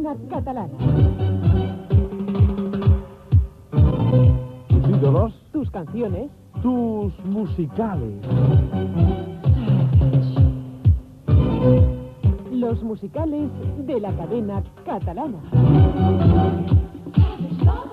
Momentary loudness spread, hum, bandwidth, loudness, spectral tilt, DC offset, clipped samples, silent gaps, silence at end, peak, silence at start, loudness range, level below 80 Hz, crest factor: 11 LU; none; 4.5 kHz; -20 LUFS; -11 dB/octave; under 0.1%; under 0.1%; none; 0 s; -4 dBFS; 0 s; 5 LU; -28 dBFS; 16 dB